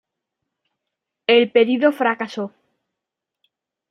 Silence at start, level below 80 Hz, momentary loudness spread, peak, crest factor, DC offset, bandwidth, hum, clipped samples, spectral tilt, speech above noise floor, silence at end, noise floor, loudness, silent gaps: 1.3 s; -76 dBFS; 14 LU; -2 dBFS; 20 dB; under 0.1%; 9.4 kHz; none; under 0.1%; -5.5 dB/octave; 67 dB; 1.4 s; -84 dBFS; -18 LUFS; none